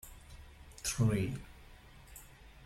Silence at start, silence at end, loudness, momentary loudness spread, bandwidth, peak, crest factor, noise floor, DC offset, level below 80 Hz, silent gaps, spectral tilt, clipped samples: 0.05 s; 0 s; -35 LUFS; 25 LU; 16.5 kHz; -18 dBFS; 20 dB; -56 dBFS; under 0.1%; -54 dBFS; none; -5 dB/octave; under 0.1%